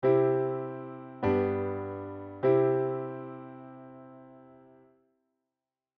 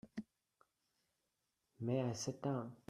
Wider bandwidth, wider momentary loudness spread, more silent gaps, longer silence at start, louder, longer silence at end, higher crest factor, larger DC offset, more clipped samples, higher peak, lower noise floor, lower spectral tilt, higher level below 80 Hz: second, 4.5 kHz vs 13 kHz; first, 23 LU vs 13 LU; neither; about the same, 0 s vs 0.05 s; first, -30 LUFS vs -42 LUFS; first, 1.6 s vs 0.15 s; about the same, 18 dB vs 20 dB; neither; neither; first, -14 dBFS vs -26 dBFS; about the same, under -90 dBFS vs -87 dBFS; first, -8 dB/octave vs -6 dB/octave; first, -68 dBFS vs -80 dBFS